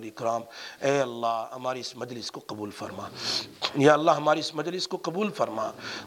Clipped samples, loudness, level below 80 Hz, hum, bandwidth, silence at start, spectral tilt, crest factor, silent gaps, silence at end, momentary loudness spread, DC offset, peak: under 0.1%; -28 LUFS; -72 dBFS; none; 17 kHz; 0 s; -4.5 dB/octave; 22 dB; none; 0 s; 15 LU; under 0.1%; -6 dBFS